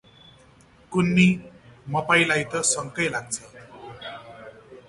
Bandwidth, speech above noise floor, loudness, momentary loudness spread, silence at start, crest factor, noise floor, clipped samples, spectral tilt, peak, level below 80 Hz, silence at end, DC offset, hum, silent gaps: 11.5 kHz; 32 dB; -22 LUFS; 24 LU; 0.9 s; 20 dB; -54 dBFS; under 0.1%; -4 dB/octave; -4 dBFS; -56 dBFS; 0.15 s; under 0.1%; none; none